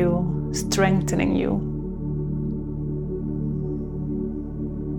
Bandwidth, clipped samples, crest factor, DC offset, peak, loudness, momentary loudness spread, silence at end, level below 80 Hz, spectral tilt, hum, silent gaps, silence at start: 18.5 kHz; under 0.1%; 20 dB; under 0.1%; -4 dBFS; -26 LUFS; 9 LU; 0 s; -36 dBFS; -6 dB/octave; none; none; 0 s